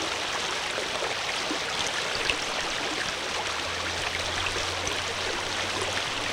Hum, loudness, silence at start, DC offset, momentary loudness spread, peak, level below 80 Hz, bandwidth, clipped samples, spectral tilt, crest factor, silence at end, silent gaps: none; -28 LUFS; 0 s; under 0.1%; 2 LU; -8 dBFS; -52 dBFS; 18 kHz; under 0.1%; -1.5 dB/octave; 22 dB; 0 s; none